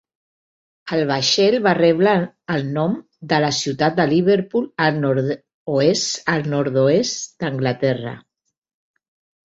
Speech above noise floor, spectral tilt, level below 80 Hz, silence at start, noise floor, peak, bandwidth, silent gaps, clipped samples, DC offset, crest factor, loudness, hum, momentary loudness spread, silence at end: over 72 dB; -5 dB/octave; -60 dBFS; 0.85 s; under -90 dBFS; -2 dBFS; 8 kHz; 5.54-5.66 s; under 0.1%; under 0.1%; 18 dB; -19 LUFS; none; 10 LU; 1.25 s